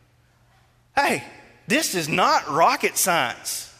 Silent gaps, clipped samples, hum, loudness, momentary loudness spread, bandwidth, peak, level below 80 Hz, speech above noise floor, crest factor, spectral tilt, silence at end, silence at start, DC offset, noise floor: none; under 0.1%; none; -21 LUFS; 7 LU; 16 kHz; -6 dBFS; -62 dBFS; 37 dB; 18 dB; -2.5 dB/octave; 0.1 s; 0.95 s; under 0.1%; -59 dBFS